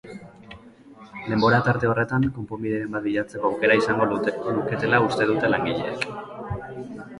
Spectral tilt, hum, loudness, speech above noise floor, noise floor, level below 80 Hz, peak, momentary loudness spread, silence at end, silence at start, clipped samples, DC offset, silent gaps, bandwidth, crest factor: -7 dB/octave; none; -23 LUFS; 24 dB; -47 dBFS; -52 dBFS; -4 dBFS; 16 LU; 0 s; 0.05 s; under 0.1%; under 0.1%; none; 11.5 kHz; 18 dB